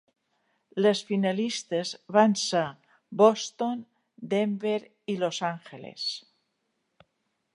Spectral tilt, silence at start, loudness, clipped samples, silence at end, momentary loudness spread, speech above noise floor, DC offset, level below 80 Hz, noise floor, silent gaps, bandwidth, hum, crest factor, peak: -4.5 dB/octave; 0.75 s; -27 LUFS; under 0.1%; 1.35 s; 16 LU; 51 dB; under 0.1%; -80 dBFS; -77 dBFS; none; 11 kHz; none; 22 dB; -6 dBFS